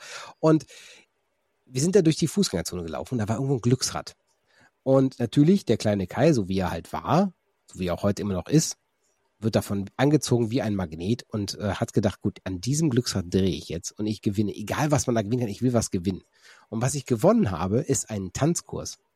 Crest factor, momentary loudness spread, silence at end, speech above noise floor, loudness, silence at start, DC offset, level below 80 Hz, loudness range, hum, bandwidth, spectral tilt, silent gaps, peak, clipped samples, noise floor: 18 dB; 10 LU; 0.2 s; 50 dB; -25 LUFS; 0 s; under 0.1%; -54 dBFS; 3 LU; none; 15.5 kHz; -5.5 dB/octave; none; -6 dBFS; under 0.1%; -74 dBFS